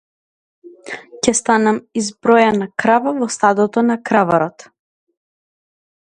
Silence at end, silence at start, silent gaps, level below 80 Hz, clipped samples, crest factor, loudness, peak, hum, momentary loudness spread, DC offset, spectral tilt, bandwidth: 1.6 s; 0.65 s; none; -56 dBFS; under 0.1%; 18 dB; -16 LUFS; 0 dBFS; none; 10 LU; under 0.1%; -4 dB/octave; 11 kHz